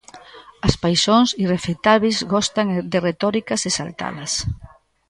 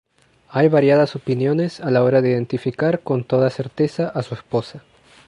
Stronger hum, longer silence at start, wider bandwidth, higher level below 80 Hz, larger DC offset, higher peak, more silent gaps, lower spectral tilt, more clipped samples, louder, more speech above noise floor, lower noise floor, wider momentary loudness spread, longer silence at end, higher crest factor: neither; second, 0.15 s vs 0.5 s; about the same, 11.5 kHz vs 10.5 kHz; first, -40 dBFS vs -60 dBFS; neither; about the same, 0 dBFS vs -2 dBFS; neither; second, -4 dB/octave vs -8 dB/octave; neither; about the same, -19 LUFS vs -19 LUFS; second, 24 dB vs 33 dB; second, -43 dBFS vs -52 dBFS; about the same, 8 LU vs 10 LU; about the same, 0.45 s vs 0.5 s; about the same, 20 dB vs 16 dB